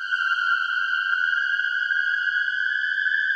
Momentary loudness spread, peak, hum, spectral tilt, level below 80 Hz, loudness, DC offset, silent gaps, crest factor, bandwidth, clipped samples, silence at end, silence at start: 1 LU; -10 dBFS; none; 3 dB/octave; -78 dBFS; -22 LUFS; under 0.1%; none; 12 dB; 8.2 kHz; under 0.1%; 0 s; 0 s